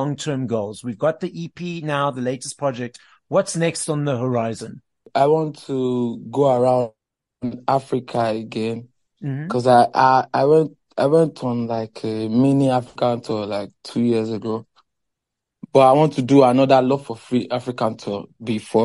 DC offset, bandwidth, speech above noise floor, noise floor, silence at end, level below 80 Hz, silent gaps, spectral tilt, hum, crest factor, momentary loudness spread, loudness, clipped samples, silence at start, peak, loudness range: under 0.1%; 11.5 kHz; 63 dB; -82 dBFS; 0 s; -64 dBFS; none; -6.5 dB/octave; none; 18 dB; 14 LU; -20 LUFS; under 0.1%; 0 s; -2 dBFS; 6 LU